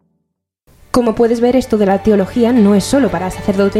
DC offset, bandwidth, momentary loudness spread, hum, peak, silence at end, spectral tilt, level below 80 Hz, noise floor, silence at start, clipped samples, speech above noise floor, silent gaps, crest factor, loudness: under 0.1%; 14.5 kHz; 6 LU; none; 0 dBFS; 0 s; -6.5 dB/octave; -38 dBFS; -71 dBFS; 0.95 s; under 0.1%; 59 dB; none; 12 dB; -13 LUFS